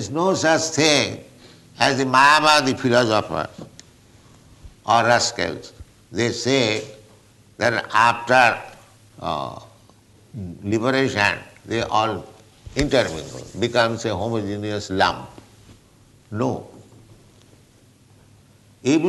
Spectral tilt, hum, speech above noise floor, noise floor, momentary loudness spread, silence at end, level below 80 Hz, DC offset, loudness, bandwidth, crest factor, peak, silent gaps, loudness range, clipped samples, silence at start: -4 dB/octave; none; 33 dB; -53 dBFS; 18 LU; 0 s; -48 dBFS; under 0.1%; -20 LUFS; 12 kHz; 20 dB; -2 dBFS; none; 9 LU; under 0.1%; 0 s